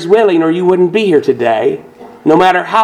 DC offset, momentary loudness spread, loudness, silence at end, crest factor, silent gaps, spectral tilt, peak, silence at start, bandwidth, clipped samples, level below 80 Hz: under 0.1%; 7 LU; -11 LUFS; 0 s; 10 dB; none; -6.5 dB/octave; 0 dBFS; 0 s; 11 kHz; 0.4%; -52 dBFS